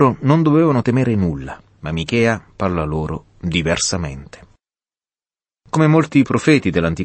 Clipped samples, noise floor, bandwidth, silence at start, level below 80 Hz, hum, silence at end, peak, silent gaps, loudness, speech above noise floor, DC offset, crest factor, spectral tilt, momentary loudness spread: under 0.1%; under -90 dBFS; 8.8 kHz; 0 s; -40 dBFS; none; 0 s; -2 dBFS; none; -17 LUFS; over 73 dB; under 0.1%; 16 dB; -6 dB/octave; 13 LU